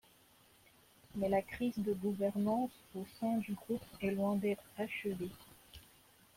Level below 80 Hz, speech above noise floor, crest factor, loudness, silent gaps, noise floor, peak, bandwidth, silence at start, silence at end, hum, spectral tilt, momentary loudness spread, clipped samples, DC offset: -68 dBFS; 29 dB; 16 dB; -38 LUFS; none; -66 dBFS; -22 dBFS; 16.5 kHz; 1.15 s; 0.55 s; none; -7 dB/octave; 15 LU; under 0.1%; under 0.1%